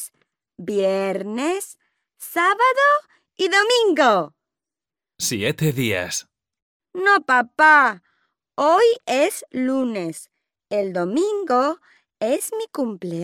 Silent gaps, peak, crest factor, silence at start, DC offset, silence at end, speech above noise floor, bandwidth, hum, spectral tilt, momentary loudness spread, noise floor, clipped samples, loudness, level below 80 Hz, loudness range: 6.62-6.80 s; -2 dBFS; 18 dB; 0 s; under 0.1%; 0 s; over 71 dB; 17 kHz; none; -4 dB/octave; 14 LU; under -90 dBFS; under 0.1%; -19 LUFS; -68 dBFS; 6 LU